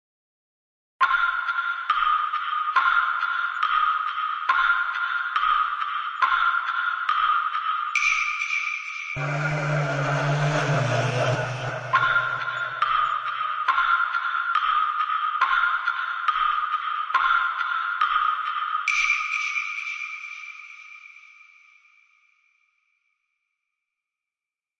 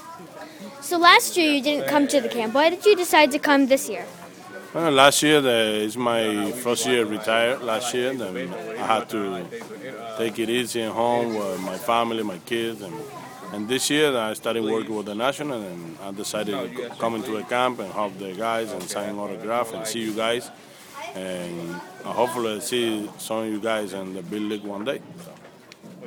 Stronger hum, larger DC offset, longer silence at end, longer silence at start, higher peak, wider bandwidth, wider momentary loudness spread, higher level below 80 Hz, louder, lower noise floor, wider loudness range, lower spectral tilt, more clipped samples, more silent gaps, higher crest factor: neither; neither; first, 3.6 s vs 0 s; first, 1 s vs 0 s; second, -8 dBFS vs 0 dBFS; second, 10 kHz vs 20 kHz; second, 7 LU vs 18 LU; first, -60 dBFS vs -68 dBFS; about the same, -23 LUFS vs -23 LUFS; first, under -90 dBFS vs -47 dBFS; second, 3 LU vs 9 LU; about the same, -4 dB/octave vs -3 dB/octave; neither; neither; second, 18 dB vs 24 dB